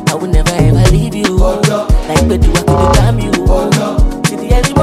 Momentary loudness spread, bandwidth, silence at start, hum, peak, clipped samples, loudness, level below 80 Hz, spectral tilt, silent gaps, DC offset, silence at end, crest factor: 4 LU; 14.5 kHz; 0 s; none; 0 dBFS; under 0.1%; -12 LUFS; -14 dBFS; -5.5 dB/octave; none; under 0.1%; 0 s; 10 dB